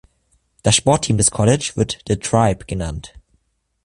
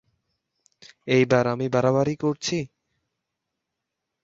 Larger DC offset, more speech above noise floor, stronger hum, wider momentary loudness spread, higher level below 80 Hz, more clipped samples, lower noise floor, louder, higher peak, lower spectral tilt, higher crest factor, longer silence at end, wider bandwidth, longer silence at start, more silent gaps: neither; second, 47 dB vs 61 dB; neither; about the same, 11 LU vs 12 LU; first, -38 dBFS vs -62 dBFS; neither; second, -65 dBFS vs -83 dBFS; first, -18 LUFS vs -23 LUFS; first, 0 dBFS vs -6 dBFS; second, -4.5 dB/octave vs -6 dB/octave; about the same, 20 dB vs 20 dB; second, 0.8 s vs 1.6 s; first, 11.5 kHz vs 7.8 kHz; second, 0.65 s vs 1.05 s; neither